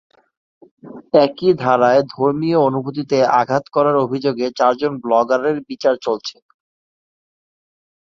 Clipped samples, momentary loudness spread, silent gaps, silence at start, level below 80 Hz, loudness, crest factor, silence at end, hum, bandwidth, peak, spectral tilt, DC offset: under 0.1%; 7 LU; none; 0.85 s; -62 dBFS; -17 LUFS; 16 dB; 1.7 s; none; 7.4 kHz; -2 dBFS; -6.5 dB/octave; under 0.1%